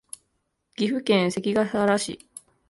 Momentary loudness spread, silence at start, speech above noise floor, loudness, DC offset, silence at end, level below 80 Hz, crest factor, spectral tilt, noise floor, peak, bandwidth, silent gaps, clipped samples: 21 LU; 0.8 s; 52 dB; -24 LUFS; under 0.1%; 0.55 s; -64 dBFS; 18 dB; -5 dB/octave; -75 dBFS; -8 dBFS; 11.5 kHz; none; under 0.1%